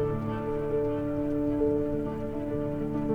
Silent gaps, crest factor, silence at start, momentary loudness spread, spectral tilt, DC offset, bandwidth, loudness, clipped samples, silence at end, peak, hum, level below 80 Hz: none; 14 dB; 0 s; 5 LU; -10 dB/octave; under 0.1%; 5 kHz; -30 LUFS; under 0.1%; 0 s; -16 dBFS; none; -44 dBFS